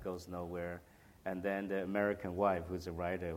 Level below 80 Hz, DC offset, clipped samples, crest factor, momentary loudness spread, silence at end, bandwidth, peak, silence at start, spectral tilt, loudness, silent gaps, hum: -62 dBFS; under 0.1%; under 0.1%; 20 dB; 10 LU; 0 s; 17 kHz; -20 dBFS; 0 s; -7 dB/octave; -38 LUFS; none; none